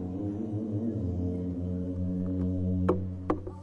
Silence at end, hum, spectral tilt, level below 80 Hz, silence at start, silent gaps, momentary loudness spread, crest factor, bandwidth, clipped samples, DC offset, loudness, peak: 0 s; none; -11 dB/octave; -54 dBFS; 0 s; none; 5 LU; 20 dB; 4.1 kHz; under 0.1%; under 0.1%; -32 LUFS; -12 dBFS